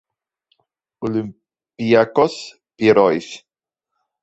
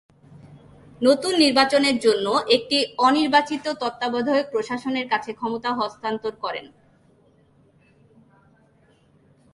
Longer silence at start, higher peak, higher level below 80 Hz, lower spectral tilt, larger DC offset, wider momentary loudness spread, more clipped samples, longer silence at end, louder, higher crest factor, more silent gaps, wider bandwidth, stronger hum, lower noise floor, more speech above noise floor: first, 1 s vs 0.45 s; about the same, -2 dBFS vs -4 dBFS; about the same, -60 dBFS vs -64 dBFS; first, -6 dB/octave vs -3 dB/octave; neither; first, 21 LU vs 11 LU; neither; second, 0.85 s vs 2.9 s; first, -17 LUFS vs -21 LUFS; about the same, 18 dB vs 20 dB; neither; second, 8.2 kHz vs 11.5 kHz; neither; first, -83 dBFS vs -58 dBFS; first, 66 dB vs 37 dB